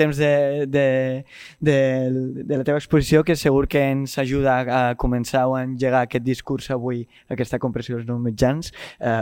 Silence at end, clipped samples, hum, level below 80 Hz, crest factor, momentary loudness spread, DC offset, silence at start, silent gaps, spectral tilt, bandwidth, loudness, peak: 0 s; under 0.1%; none; -40 dBFS; 18 dB; 10 LU; under 0.1%; 0 s; none; -6.5 dB/octave; 17 kHz; -21 LUFS; -2 dBFS